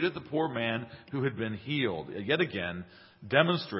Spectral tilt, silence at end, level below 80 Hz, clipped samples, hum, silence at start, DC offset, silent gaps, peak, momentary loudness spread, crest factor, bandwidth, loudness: -9.5 dB/octave; 0 s; -62 dBFS; under 0.1%; none; 0 s; under 0.1%; none; -6 dBFS; 12 LU; 24 dB; 5.8 kHz; -31 LUFS